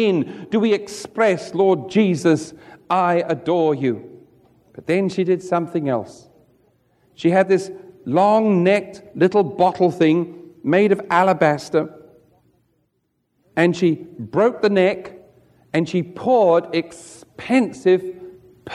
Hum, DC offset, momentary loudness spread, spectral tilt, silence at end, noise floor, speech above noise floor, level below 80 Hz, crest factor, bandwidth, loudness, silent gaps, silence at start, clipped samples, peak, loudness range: none; under 0.1%; 15 LU; -6.5 dB/octave; 0 s; -70 dBFS; 52 dB; -64 dBFS; 16 dB; 12 kHz; -19 LUFS; none; 0 s; under 0.1%; -2 dBFS; 4 LU